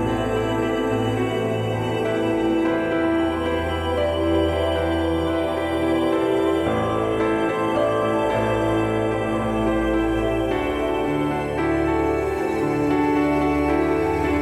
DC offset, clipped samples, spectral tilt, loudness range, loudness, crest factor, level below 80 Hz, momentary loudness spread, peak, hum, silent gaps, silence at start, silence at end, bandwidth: under 0.1%; under 0.1%; -7 dB/octave; 1 LU; -22 LUFS; 12 dB; -38 dBFS; 3 LU; -8 dBFS; none; none; 0 s; 0 s; 14.5 kHz